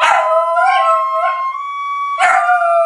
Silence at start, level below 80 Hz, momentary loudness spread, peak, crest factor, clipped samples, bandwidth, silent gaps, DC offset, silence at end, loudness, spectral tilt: 0 s; -66 dBFS; 9 LU; -2 dBFS; 12 dB; under 0.1%; 11.5 kHz; none; under 0.1%; 0 s; -14 LUFS; 1 dB/octave